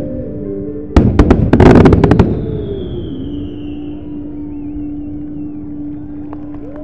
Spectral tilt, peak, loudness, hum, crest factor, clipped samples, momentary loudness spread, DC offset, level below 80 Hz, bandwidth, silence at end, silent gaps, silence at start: -9 dB/octave; 0 dBFS; -12 LUFS; none; 14 dB; 1%; 19 LU; 3%; -22 dBFS; 9.2 kHz; 0 s; none; 0 s